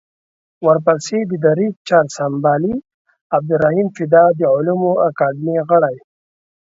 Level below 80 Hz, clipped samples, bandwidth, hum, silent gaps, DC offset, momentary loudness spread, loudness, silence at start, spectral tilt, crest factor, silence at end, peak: -58 dBFS; under 0.1%; 7.8 kHz; none; 1.76-1.85 s, 2.94-3.05 s, 3.21-3.30 s; under 0.1%; 8 LU; -16 LUFS; 0.6 s; -7 dB/octave; 16 dB; 0.7 s; 0 dBFS